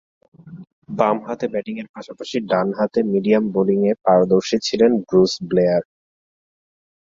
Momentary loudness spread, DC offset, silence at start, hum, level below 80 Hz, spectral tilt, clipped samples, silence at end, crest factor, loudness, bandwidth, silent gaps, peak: 11 LU; under 0.1%; 0.45 s; none; -60 dBFS; -6 dB/octave; under 0.1%; 1.2 s; 18 dB; -19 LUFS; 7.6 kHz; 0.72-0.82 s, 1.89-1.94 s; -2 dBFS